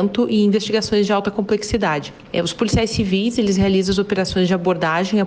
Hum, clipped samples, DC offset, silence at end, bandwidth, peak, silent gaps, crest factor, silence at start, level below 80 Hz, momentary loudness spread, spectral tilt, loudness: none; under 0.1%; under 0.1%; 0 s; 9.6 kHz; -6 dBFS; none; 12 dB; 0 s; -40 dBFS; 4 LU; -5.5 dB/octave; -18 LUFS